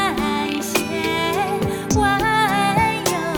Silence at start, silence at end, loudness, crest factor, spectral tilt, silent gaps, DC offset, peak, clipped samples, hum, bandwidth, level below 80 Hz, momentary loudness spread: 0 s; 0 s; -19 LUFS; 16 dB; -4 dB/octave; none; under 0.1%; -4 dBFS; under 0.1%; none; 18 kHz; -40 dBFS; 4 LU